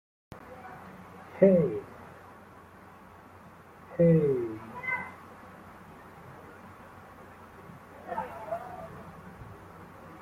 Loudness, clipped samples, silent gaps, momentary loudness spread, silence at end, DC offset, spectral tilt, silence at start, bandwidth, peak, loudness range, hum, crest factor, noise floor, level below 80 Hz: -28 LUFS; under 0.1%; none; 28 LU; 0 s; under 0.1%; -9.5 dB/octave; 0.3 s; 14 kHz; -8 dBFS; 13 LU; none; 24 dB; -52 dBFS; -64 dBFS